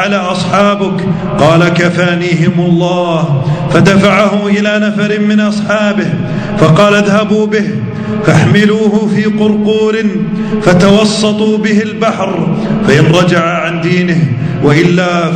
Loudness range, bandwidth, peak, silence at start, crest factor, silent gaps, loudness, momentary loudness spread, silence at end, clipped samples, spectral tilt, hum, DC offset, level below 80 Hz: 1 LU; 9.4 kHz; 0 dBFS; 0 s; 10 dB; none; -10 LUFS; 6 LU; 0 s; 2%; -6.5 dB/octave; none; under 0.1%; -38 dBFS